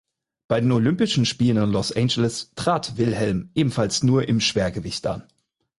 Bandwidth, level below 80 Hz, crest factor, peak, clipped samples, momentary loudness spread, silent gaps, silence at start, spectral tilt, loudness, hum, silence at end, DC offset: 11.5 kHz; -48 dBFS; 14 dB; -8 dBFS; under 0.1%; 7 LU; none; 0.5 s; -5.5 dB/octave; -22 LUFS; none; 0.55 s; under 0.1%